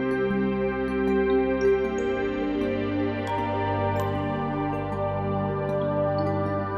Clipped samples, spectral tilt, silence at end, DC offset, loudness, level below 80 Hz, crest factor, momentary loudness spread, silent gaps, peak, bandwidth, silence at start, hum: under 0.1%; -8 dB/octave; 0 s; under 0.1%; -26 LUFS; -46 dBFS; 12 dB; 5 LU; none; -14 dBFS; 13 kHz; 0 s; none